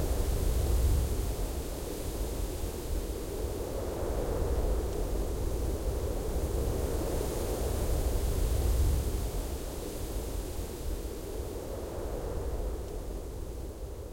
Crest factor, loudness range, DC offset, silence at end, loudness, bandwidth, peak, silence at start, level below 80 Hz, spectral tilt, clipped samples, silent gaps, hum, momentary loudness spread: 14 dB; 6 LU; under 0.1%; 0 s; -35 LUFS; 16.5 kHz; -16 dBFS; 0 s; -34 dBFS; -6 dB/octave; under 0.1%; none; none; 8 LU